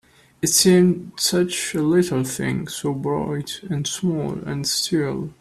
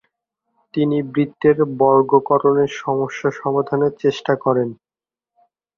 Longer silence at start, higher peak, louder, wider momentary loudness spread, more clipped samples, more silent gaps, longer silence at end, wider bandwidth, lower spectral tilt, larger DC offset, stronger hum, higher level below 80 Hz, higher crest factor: second, 0.4 s vs 0.75 s; about the same, -2 dBFS vs -2 dBFS; second, -21 LUFS vs -18 LUFS; first, 11 LU vs 7 LU; neither; neither; second, 0.05 s vs 1.05 s; first, 14.5 kHz vs 7 kHz; second, -4 dB/octave vs -7.5 dB/octave; neither; neither; first, -54 dBFS vs -62 dBFS; about the same, 20 dB vs 16 dB